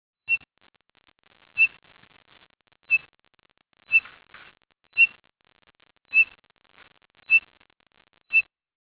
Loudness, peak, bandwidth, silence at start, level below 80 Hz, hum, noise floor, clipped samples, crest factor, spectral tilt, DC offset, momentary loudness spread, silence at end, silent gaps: -21 LUFS; -8 dBFS; 4 kHz; 0.3 s; -72 dBFS; none; -66 dBFS; under 0.1%; 20 dB; 3.5 dB/octave; under 0.1%; 7 LU; 0.4 s; none